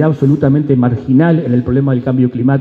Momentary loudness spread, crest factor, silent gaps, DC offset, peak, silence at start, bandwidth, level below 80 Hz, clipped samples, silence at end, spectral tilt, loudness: 3 LU; 12 dB; none; under 0.1%; 0 dBFS; 0 s; 4.5 kHz; -42 dBFS; under 0.1%; 0 s; -11 dB/octave; -12 LUFS